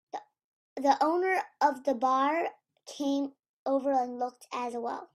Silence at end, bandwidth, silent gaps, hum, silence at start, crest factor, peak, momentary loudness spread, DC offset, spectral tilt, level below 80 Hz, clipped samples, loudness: 0.1 s; 14 kHz; 0.44-0.76 s, 3.39-3.43 s, 3.49-3.66 s; none; 0.15 s; 18 dB; -12 dBFS; 13 LU; under 0.1%; -3.5 dB/octave; -80 dBFS; under 0.1%; -30 LUFS